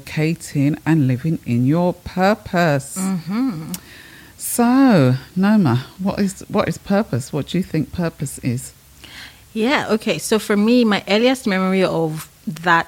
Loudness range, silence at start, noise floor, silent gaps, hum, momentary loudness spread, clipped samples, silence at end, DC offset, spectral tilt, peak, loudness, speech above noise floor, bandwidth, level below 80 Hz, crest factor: 5 LU; 0.05 s; -39 dBFS; none; none; 13 LU; under 0.1%; 0 s; under 0.1%; -6 dB/octave; 0 dBFS; -18 LUFS; 22 dB; 17 kHz; -50 dBFS; 18 dB